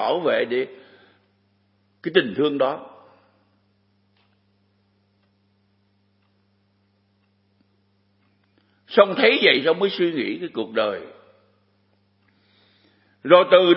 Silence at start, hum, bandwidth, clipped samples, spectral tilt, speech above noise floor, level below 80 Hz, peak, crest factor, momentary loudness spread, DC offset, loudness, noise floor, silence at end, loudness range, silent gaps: 0 s; none; 5.8 kHz; under 0.1%; -9 dB/octave; 46 dB; -78 dBFS; 0 dBFS; 24 dB; 18 LU; under 0.1%; -20 LUFS; -65 dBFS; 0 s; 9 LU; none